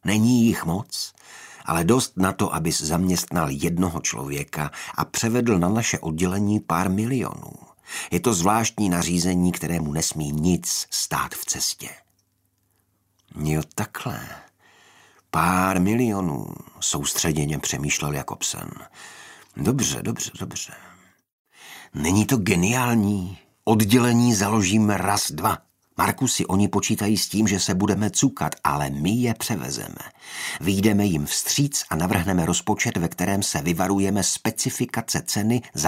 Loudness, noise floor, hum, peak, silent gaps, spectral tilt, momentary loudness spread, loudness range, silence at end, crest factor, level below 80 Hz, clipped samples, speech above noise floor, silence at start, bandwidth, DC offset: -23 LUFS; -69 dBFS; none; -2 dBFS; 21.32-21.45 s; -4.5 dB/octave; 12 LU; 6 LU; 0 s; 22 dB; -48 dBFS; under 0.1%; 46 dB; 0.05 s; 16 kHz; under 0.1%